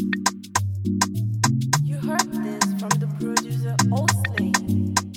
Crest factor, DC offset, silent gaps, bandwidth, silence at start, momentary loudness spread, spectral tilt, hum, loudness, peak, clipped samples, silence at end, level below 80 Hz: 20 dB; under 0.1%; none; 19 kHz; 0 s; 4 LU; -4 dB/octave; none; -23 LUFS; -2 dBFS; under 0.1%; 0 s; -58 dBFS